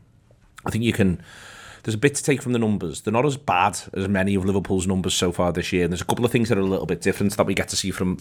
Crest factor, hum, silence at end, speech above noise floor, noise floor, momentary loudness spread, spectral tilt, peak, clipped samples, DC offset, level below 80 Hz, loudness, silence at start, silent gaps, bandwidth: 18 dB; none; 0 s; 33 dB; -55 dBFS; 8 LU; -5 dB/octave; -4 dBFS; under 0.1%; under 0.1%; -50 dBFS; -22 LUFS; 0.65 s; none; 18.5 kHz